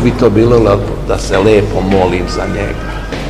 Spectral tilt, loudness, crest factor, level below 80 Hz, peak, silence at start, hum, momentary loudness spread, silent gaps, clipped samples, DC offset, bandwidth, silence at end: -6.5 dB/octave; -12 LUFS; 12 dB; -22 dBFS; 0 dBFS; 0 s; none; 10 LU; none; 0.8%; 0.8%; 14.5 kHz; 0 s